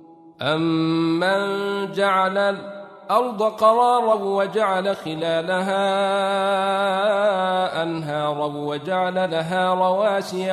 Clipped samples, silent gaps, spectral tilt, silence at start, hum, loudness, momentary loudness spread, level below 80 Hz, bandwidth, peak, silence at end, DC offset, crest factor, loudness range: under 0.1%; none; -5.5 dB/octave; 0.1 s; none; -21 LUFS; 7 LU; -70 dBFS; 13.5 kHz; -4 dBFS; 0 s; under 0.1%; 18 dB; 2 LU